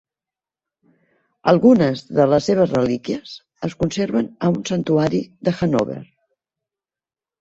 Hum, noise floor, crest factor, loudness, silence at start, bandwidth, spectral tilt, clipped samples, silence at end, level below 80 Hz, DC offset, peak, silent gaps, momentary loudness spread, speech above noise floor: none; under -90 dBFS; 18 dB; -19 LUFS; 1.45 s; 8 kHz; -7 dB/octave; under 0.1%; 1.35 s; -52 dBFS; under 0.1%; -2 dBFS; none; 13 LU; over 72 dB